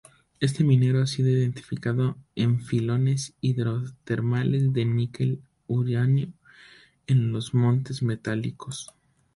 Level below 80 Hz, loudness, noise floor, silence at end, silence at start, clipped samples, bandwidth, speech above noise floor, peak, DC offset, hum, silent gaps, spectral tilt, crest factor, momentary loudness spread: -58 dBFS; -25 LUFS; -53 dBFS; 0.5 s; 0.4 s; under 0.1%; 11.5 kHz; 29 dB; -8 dBFS; under 0.1%; none; none; -7 dB/octave; 16 dB; 9 LU